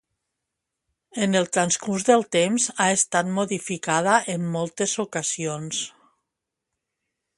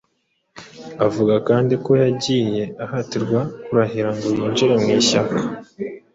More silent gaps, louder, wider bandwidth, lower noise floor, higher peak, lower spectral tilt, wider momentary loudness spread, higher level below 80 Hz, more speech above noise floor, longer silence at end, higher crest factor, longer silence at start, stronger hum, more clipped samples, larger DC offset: neither; second, -23 LUFS vs -19 LUFS; first, 11.5 kHz vs 8 kHz; first, -83 dBFS vs -69 dBFS; about the same, -4 dBFS vs -2 dBFS; second, -3.5 dB/octave vs -5.5 dB/octave; second, 9 LU vs 12 LU; second, -68 dBFS vs -56 dBFS; first, 61 dB vs 50 dB; first, 1.5 s vs 0.15 s; first, 22 dB vs 16 dB; first, 1.15 s vs 0.55 s; neither; neither; neither